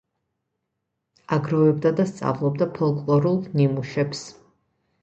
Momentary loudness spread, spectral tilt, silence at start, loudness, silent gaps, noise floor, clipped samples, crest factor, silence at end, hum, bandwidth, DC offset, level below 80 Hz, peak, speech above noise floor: 7 LU; -8 dB/octave; 1.3 s; -22 LUFS; none; -79 dBFS; under 0.1%; 18 dB; 0.7 s; none; 8.4 kHz; under 0.1%; -62 dBFS; -6 dBFS; 58 dB